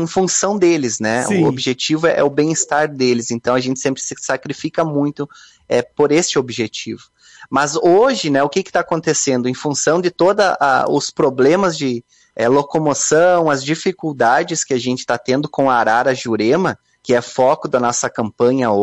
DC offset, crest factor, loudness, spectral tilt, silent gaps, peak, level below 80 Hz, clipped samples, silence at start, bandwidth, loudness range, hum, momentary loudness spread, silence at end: under 0.1%; 14 dB; -16 LUFS; -4 dB/octave; none; -2 dBFS; -58 dBFS; under 0.1%; 0 s; 11.5 kHz; 4 LU; none; 8 LU; 0 s